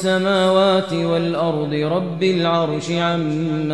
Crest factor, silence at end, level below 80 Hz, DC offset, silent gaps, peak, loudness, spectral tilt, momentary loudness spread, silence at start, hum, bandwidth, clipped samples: 14 dB; 0 s; -58 dBFS; 0.3%; none; -4 dBFS; -19 LUFS; -6 dB/octave; 6 LU; 0 s; none; 11.5 kHz; under 0.1%